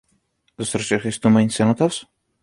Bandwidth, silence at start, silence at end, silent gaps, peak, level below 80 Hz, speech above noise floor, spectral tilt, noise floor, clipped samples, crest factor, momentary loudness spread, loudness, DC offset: 11.5 kHz; 0.6 s; 0.4 s; none; -4 dBFS; -56 dBFS; 47 dB; -5.5 dB/octave; -66 dBFS; under 0.1%; 18 dB; 11 LU; -20 LUFS; under 0.1%